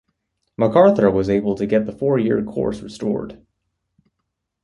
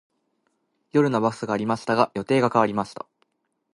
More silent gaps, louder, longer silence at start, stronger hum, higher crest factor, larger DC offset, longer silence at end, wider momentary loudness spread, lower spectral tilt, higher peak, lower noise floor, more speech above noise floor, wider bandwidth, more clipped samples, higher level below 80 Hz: neither; first, -19 LUFS vs -23 LUFS; second, 0.6 s vs 0.95 s; neither; about the same, 18 dB vs 22 dB; neither; first, 1.3 s vs 0.8 s; about the same, 12 LU vs 12 LU; first, -8 dB/octave vs -6.5 dB/octave; about the same, -2 dBFS vs -2 dBFS; first, -77 dBFS vs -72 dBFS; first, 59 dB vs 50 dB; about the same, 11 kHz vs 11.5 kHz; neither; first, -48 dBFS vs -64 dBFS